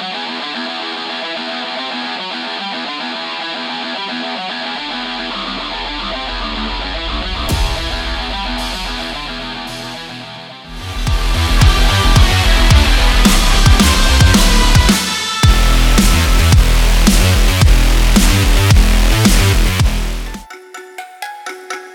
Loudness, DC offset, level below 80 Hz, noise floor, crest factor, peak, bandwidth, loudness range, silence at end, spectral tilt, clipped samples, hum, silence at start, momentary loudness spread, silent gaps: -14 LUFS; under 0.1%; -16 dBFS; -33 dBFS; 12 dB; 0 dBFS; 18 kHz; 10 LU; 0 s; -4 dB/octave; under 0.1%; none; 0 s; 15 LU; none